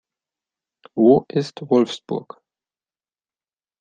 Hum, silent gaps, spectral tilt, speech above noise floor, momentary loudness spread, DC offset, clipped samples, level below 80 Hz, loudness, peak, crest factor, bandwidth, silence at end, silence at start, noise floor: none; none; -7 dB/octave; over 72 dB; 14 LU; under 0.1%; under 0.1%; -68 dBFS; -19 LUFS; -2 dBFS; 20 dB; 9 kHz; 1.6 s; 0.95 s; under -90 dBFS